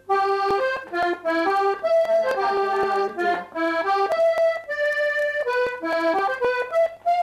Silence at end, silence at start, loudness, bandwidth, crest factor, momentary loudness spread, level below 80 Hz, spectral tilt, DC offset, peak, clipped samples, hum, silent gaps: 0 s; 0.1 s; -22 LUFS; 13.5 kHz; 10 dB; 5 LU; -62 dBFS; -4 dB/octave; under 0.1%; -12 dBFS; under 0.1%; none; none